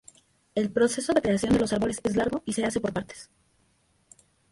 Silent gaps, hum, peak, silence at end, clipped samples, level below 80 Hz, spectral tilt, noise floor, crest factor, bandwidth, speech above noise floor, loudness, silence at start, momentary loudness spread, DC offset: none; none; -10 dBFS; 1.3 s; under 0.1%; -52 dBFS; -5 dB/octave; -67 dBFS; 18 dB; 11.5 kHz; 41 dB; -26 LUFS; 0.55 s; 10 LU; under 0.1%